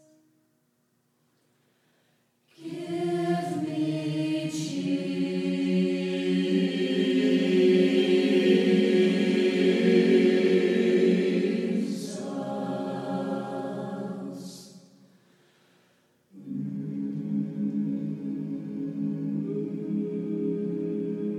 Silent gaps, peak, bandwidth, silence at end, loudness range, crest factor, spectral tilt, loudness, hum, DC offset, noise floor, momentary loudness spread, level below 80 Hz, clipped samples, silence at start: none; -10 dBFS; 12 kHz; 0 s; 14 LU; 16 dB; -6.5 dB/octave; -26 LUFS; none; under 0.1%; -71 dBFS; 13 LU; -78 dBFS; under 0.1%; 2.6 s